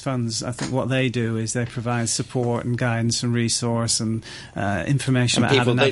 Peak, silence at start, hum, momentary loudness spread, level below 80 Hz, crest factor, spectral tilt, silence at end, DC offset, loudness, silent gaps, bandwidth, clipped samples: -6 dBFS; 0 s; none; 8 LU; -52 dBFS; 16 dB; -4.5 dB/octave; 0 s; under 0.1%; -22 LUFS; none; 11.5 kHz; under 0.1%